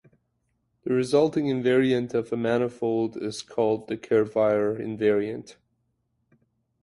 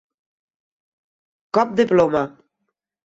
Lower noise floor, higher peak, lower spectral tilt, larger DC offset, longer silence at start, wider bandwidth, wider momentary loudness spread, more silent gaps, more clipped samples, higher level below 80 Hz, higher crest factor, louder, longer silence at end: about the same, -74 dBFS vs -77 dBFS; second, -8 dBFS vs -4 dBFS; about the same, -6.5 dB/octave vs -6.5 dB/octave; neither; second, 0.85 s vs 1.55 s; first, 11.5 kHz vs 8 kHz; about the same, 8 LU vs 8 LU; neither; neither; about the same, -64 dBFS vs -60 dBFS; about the same, 18 dB vs 20 dB; second, -25 LUFS vs -19 LUFS; first, 1.3 s vs 0.8 s